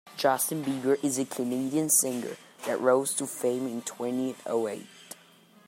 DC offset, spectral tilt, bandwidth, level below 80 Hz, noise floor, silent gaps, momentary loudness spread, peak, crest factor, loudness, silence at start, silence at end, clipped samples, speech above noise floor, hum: under 0.1%; -3.5 dB/octave; 16 kHz; -80 dBFS; -57 dBFS; none; 16 LU; -10 dBFS; 20 dB; -28 LUFS; 0.05 s; 0.55 s; under 0.1%; 29 dB; none